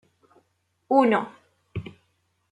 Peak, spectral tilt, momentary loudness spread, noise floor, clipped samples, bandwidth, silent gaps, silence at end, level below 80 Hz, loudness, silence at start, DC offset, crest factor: -6 dBFS; -7.5 dB/octave; 19 LU; -71 dBFS; under 0.1%; 11 kHz; none; 0.7 s; -62 dBFS; -22 LUFS; 0.9 s; under 0.1%; 22 dB